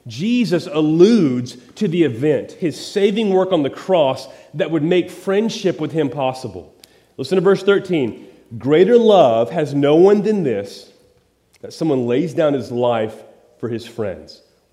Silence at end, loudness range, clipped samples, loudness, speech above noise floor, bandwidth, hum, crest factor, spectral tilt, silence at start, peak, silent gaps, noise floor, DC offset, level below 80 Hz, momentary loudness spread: 0.5 s; 7 LU; under 0.1%; -17 LUFS; 40 dB; 12.5 kHz; none; 18 dB; -6.5 dB/octave; 0.05 s; 0 dBFS; none; -57 dBFS; under 0.1%; -64 dBFS; 15 LU